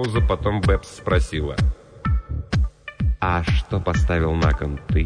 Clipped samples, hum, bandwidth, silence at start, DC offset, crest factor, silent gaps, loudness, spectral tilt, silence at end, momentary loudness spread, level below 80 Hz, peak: under 0.1%; none; 10 kHz; 0 s; under 0.1%; 16 dB; none; -23 LUFS; -7 dB/octave; 0 s; 5 LU; -24 dBFS; -6 dBFS